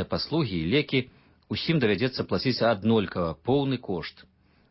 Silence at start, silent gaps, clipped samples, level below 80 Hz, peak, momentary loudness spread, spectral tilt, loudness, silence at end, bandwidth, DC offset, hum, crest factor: 0 s; none; under 0.1%; -50 dBFS; -12 dBFS; 10 LU; -10 dB/octave; -26 LUFS; 0.5 s; 5.8 kHz; under 0.1%; none; 16 dB